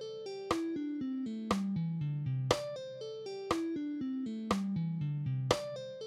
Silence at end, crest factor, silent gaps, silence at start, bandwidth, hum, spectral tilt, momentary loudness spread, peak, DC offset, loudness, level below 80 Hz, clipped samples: 0 s; 24 dB; none; 0 s; 15.5 kHz; none; -6 dB/octave; 9 LU; -10 dBFS; under 0.1%; -36 LUFS; -62 dBFS; under 0.1%